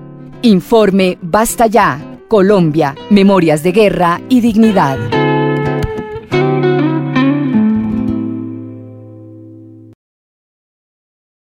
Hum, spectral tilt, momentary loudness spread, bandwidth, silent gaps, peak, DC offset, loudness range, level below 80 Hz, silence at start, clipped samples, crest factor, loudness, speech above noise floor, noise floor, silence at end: none; -6.5 dB/octave; 11 LU; 16.5 kHz; none; 0 dBFS; under 0.1%; 9 LU; -38 dBFS; 0 s; under 0.1%; 12 dB; -12 LUFS; 25 dB; -35 dBFS; 1.8 s